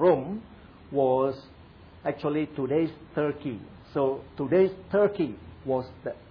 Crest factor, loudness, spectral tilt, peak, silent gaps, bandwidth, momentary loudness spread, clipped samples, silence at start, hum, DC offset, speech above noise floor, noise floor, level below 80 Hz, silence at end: 18 dB; -28 LUFS; -10 dB/octave; -10 dBFS; none; 5.2 kHz; 13 LU; under 0.1%; 0 s; none; under 0.1%; 23 dB; -50 dBFS; -58 dBFS; 0.1 s